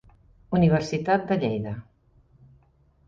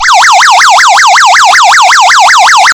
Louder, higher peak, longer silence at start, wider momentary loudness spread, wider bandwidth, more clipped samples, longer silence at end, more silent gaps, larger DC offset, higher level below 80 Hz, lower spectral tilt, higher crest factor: second, -24 LUFS vs -1 LUFS; second, -8 dBFS vs 0 dBFS; first, 0.5 s vs 0 s; first, 12 LU vs 0 LU; second, 7.6 kHz vs over 20 kHz; second, under 0.1% vs 7%; first, 1.25 s vs 0 s; neither; neither; about the same, -52 dBFS vs -48 dBFS; first, -7.5 dB/octave vs 3 dB/octave; first, 18 dB vs 2 dB